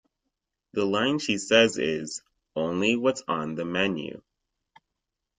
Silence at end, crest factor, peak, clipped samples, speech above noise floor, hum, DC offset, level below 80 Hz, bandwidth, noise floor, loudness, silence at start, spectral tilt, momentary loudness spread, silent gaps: 1.2 s; 24 dB; -2 dBFS; under 0.1%; 59 dB; none; under 0.1%; -66 dBFS; 9.6 kHz; -84 dBFS; -25 LUFS; 0.75 s; -4 dB/octave; 16 LU; none